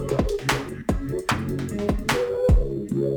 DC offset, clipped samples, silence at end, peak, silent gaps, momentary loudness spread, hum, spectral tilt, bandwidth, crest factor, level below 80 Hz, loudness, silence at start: under 0.1%; under 0.1%; 0 s; -8 dBFS; none; 6 LU; none; -5.5 dB/octave; over 20 kHz; 16 dB; -28 dBFS; -25 LUFS; 0 s